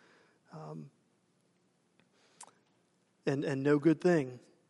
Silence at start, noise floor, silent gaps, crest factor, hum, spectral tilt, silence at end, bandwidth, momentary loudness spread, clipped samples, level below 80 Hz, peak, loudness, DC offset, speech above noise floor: 0.55 s; -73 dBFS; none; 20 dB; none; -7.5 dB/octave; 0.3 s; 11.5 kHz; 20 LU; under 0.1%; -82 dBFS; -16 dBFS; -31 LUFS; under 0.1%; 43 dB